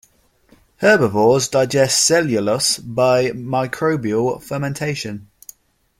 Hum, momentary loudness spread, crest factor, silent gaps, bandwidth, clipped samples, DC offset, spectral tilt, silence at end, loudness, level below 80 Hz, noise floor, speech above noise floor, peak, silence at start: none; 10 LU; 18 dB; none; 16.5 kHz; under 0.1%; under 0.1%; -3.5 dB/octave; 0.75 s; -17 LUFS; -54 dBFS; -55 dBFS; 38 dB; -2 dBFS; 0.8 s